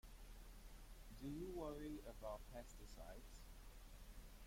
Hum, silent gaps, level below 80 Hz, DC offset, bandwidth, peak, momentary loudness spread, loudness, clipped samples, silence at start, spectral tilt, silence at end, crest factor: none; none; -60 dBFS; under 0.1%; 16.5 kHz; -38 dBFS; 12 LU; -56 LUFS; under 0.1%; 0.05 s; -5.5 dB/octave; 0 s; 16 dB